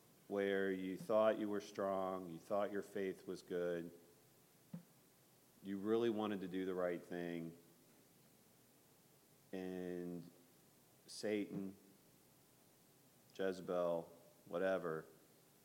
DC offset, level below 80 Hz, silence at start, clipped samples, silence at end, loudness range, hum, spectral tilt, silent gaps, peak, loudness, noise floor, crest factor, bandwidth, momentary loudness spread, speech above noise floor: under 0.1%; -88 dBFS; 0.3 s; under 0.1%; 0.5 s; 10 LU; none; -6 dB/octave; none; -24 dBFS; -43 LUFS; -70 dBFS; 22 dB; 16.5 kHz; 19 LU; 28 dB